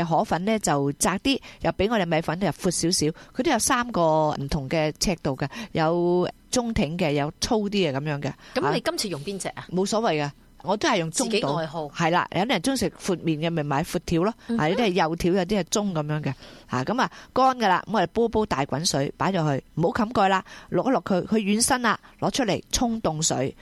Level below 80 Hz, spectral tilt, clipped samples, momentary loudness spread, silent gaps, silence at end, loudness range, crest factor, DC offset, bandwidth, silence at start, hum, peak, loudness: -46 dBFS; -4.5 dB/octave; under 0.1%; 7 LU; none; 0.1 s; 2 LU; 16 dB; under 0.1%; 14.5 kHz; 0 s; none; -8 dBFS; -24 LUFS